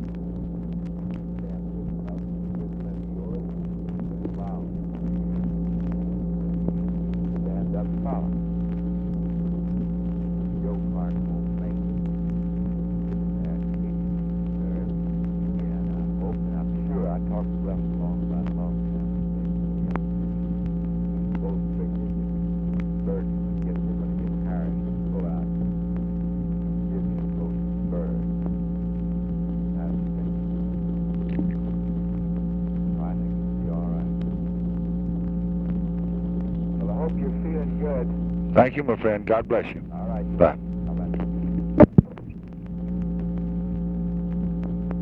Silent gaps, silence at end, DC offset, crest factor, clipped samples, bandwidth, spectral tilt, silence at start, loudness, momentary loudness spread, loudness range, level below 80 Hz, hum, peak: none; 0 s; under 0.1%; 26 dB; under 0.1%; 3.3 kHz; -12 dB/octave; 0 s; -27 LUFS; 5 LU; 5 LU; -34 dBFS; none; 0 dBFS